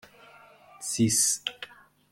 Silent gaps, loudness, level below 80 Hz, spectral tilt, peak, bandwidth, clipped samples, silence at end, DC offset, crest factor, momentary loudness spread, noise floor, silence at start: none; -26 LUFS; -66 dBFS; -2.5 dB/octave; -12 dBFS; 16.5 kHz; under 0.1%; 0.45 s; under 0.1%; 20 dB; 21 LU; -54 dBFS; 0.8 s